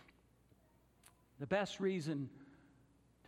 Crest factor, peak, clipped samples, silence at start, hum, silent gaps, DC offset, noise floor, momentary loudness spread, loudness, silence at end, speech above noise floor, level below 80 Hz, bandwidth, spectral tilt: 22 dB; -22 dBFS; under 0.1%; 1.4 s; none; none; under 0.1%; -71 dBFS; 14 LU; -40 LUFS; 0.75 s; 32 dB; -74 dBFS; 14.5 kHz; -6 dB/octave